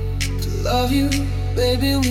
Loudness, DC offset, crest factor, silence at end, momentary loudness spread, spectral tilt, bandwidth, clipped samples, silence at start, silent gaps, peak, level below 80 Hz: -20 LUFS; under 0.1%; 14 dB; 0 s; 5 LU; -5.5 dB/octave; 17 kHz; under 0.1%; 0 s; none; -6 dBFS; -26 dBFS